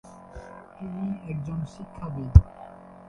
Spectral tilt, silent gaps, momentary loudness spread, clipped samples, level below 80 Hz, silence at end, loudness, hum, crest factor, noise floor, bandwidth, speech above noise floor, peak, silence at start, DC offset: -9.5 dB/octave; none; 26 LU; under 0.1%; -28 dBFS; 0.4 s; -25 LUFS; none; 26 dB; -44 dBFS; 6.6 kHz; 20 dB; 0 dBFS; 0.35 s; under 0.1%